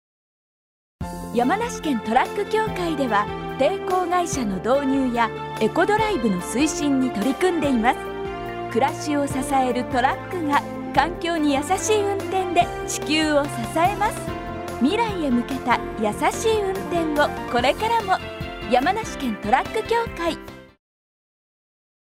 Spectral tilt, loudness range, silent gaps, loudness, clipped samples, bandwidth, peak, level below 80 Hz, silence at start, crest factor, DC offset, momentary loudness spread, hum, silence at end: -4.5 dB/octave; 2 LU; none; -22 LUFS; under 0.1%; 16 kHz; -4 dBFS; -44 dBFS; 1 s; 18 dB; under 0.1%; 7 LU; none; 1.5 s